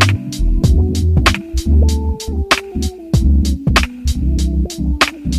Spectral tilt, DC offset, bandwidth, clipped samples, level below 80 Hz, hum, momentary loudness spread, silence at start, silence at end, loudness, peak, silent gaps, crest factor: -5 dB/octave; under 0.1%; 14.5 kHz; under 0.1%; -16 dBFS; none; 6 LU; 0 s; 0 s; -16 LUFS; 0 dBFS; none; 14 dB